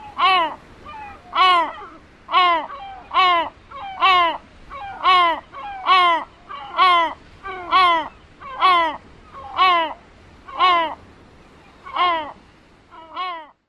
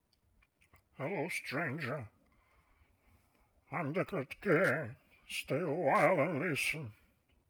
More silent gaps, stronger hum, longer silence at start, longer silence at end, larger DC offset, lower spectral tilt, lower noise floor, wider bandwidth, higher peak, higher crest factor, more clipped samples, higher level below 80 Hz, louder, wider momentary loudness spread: neither; neither; second, 0 s vs 1 s; second, 0.25 s vs 0.6 s; neither; second, -3 dB/octave vs -5.5 dB/octave; second, -50 dBFS vs -72 dBFS; second, 12 kHz vs over 20 kHz; first, -4 dBFS vs -16 dBFS; about the same, 18 dB vs 20 dB; neither; first, -52 dBFS vs -72 dBFS; first, -18 LUFS vs -35 LUFS; first, 20 LU vs 14 LU